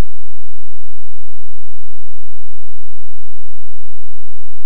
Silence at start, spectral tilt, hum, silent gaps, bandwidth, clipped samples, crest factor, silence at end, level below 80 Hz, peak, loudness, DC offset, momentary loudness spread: 0 s; -14.5 dB/octave; none; none; 0.7 kHz; under 0.1%; 4 dB; 0 s; -48 dBFS; 0 dBFS; -39 LUFS; 90%; 0 LU